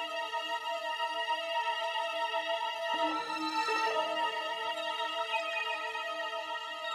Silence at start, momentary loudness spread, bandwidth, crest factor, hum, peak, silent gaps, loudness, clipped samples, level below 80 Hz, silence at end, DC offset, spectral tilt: 0 s; 5 LU; 18 kHz; 16 dB; none; -20 dBFS; none; -33 LUFS; under 0.1%; -82 dBFS; 0 s; under 0.1%; -0.5 dB/octave